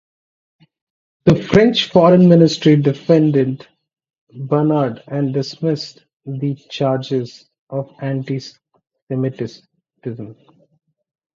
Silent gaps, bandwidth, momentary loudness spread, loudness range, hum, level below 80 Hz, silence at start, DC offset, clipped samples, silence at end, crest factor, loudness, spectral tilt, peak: 4.18-4.27 s, 6.13-6.20 s, 7.59-7.67 s, 9.02-9.07 s; 7.4 kHz; 20 LU; 13 LU; none; -52 dBFS; 1.25 s; under 0.1%; under 0.1%; 1 s; 18 dB; -16 LUFS; -7.5 dB/octave; 0 dBFS